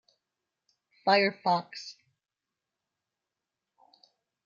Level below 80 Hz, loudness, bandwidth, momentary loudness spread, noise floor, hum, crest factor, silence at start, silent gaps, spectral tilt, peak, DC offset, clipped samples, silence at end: -86 dBFS; -27 LUFS; 7.4 kHz; 18 LU; -89 dBFS; none; 24 dB; 1.05 s; none; -4.5 dB/octave; -10 dBFS; under 0.1%; under 0.1%; 2.55 s